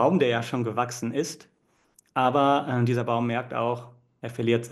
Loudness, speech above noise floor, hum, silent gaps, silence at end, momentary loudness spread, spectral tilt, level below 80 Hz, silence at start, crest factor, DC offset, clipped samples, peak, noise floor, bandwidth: -26 LUFS; 39 dB; none; none; 0 s; 12 LU; -6 dB/octave; -70 dBFS; 0 s; 16 dB; under 0.1%; under 0.1%; -10 dBFS; -64 dBFS; 12.5 kHz